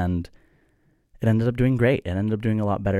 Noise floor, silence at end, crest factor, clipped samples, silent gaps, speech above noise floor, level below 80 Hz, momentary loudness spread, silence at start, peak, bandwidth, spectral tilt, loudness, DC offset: -64 dBFS; 0 s; 16 dB; under 0.1%; none; 42 dB; -44 dBFS; 7 LU; 0 s; -6 dBFS; 11 kHz; -9 dB/octave; -23 LUFS; under 0.1%